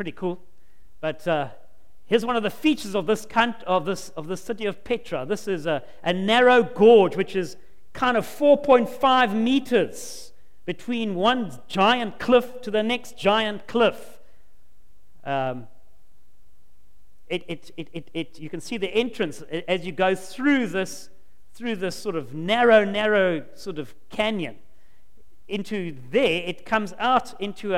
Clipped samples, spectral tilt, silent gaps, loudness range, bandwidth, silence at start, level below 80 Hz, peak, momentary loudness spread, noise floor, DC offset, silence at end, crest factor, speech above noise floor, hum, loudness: under 0.1%; -5 dB/octave; none; 11 LU; 16.5 kHz; 0 s; -56 dBFS; -4 dBFS; 17 LU; -60 dBFS; 2%; 0 s; 20 dB; 37 dB; none; -23 LUFS